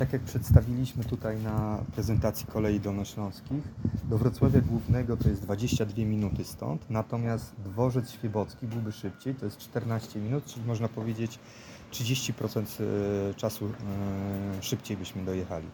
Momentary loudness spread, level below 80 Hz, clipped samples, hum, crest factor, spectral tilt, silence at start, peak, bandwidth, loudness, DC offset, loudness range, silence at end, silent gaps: 10 LU; -42 dBFS; under 0.1%; none; 24 dB; -6.5 dB/octave; 0 s; -6 dBFS; 19 kHz; -31 LUFS; under 0.1%; 5 LU; 0 s; none